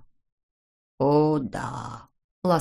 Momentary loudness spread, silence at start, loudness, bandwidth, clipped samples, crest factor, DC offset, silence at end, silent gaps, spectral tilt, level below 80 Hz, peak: 17 LU; 1 s; -25 LUFS; 13 kHz; under 0.1%; 18 dB; under 0.1%; 0 s; 2.24-2.42 s; -8 dB/octave; -56 dBFS; -8 dBFS